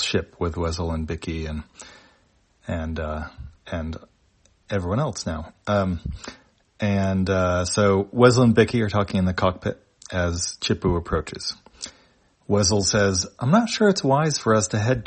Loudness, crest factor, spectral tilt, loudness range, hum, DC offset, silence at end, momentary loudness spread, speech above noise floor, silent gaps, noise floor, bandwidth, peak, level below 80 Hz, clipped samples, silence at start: -22 LUFS; 22 dB; -5 dB/octave; 11 LU; none; under 0.1%; 0 s; 17 LU; 40 dB; none; -62 dBFS; 8.8 kHz; 0 dBFS; -44 dBFS; under 0.1%; 0 s